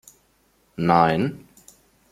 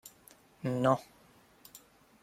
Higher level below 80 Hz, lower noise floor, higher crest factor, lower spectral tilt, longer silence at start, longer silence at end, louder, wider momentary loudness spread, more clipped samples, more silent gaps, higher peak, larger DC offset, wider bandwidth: first, -58 dBFS vs -72 dBFS; about the same, -63 dBFS vs -61 dBFS; about the same, 22 dB vs 24 dB; about the same, -7 dB/octave vs -6.5 dB/octave; first, 0.8 s vs 0.05 s; first, 0.75 s vs 0.45 s; first, -21 LUFS vs -32 LUFS; about the same, 24 LU vs 24 LU; neither; neither; first, -2 dBFS vs -12 dBFS; neither; about the same, 15 kHz vs 16.5 kHz